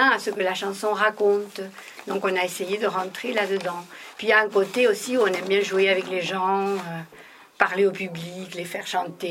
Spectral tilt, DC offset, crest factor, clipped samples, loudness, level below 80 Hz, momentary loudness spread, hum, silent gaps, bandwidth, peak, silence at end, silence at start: -4 dB/octave; under 0.1%; 22 dB; under 0.1%; -23 LUFS; -78 dBFS; 14 LU; none; none; 16 kHz; -2 dBFS; 0 s; 0 s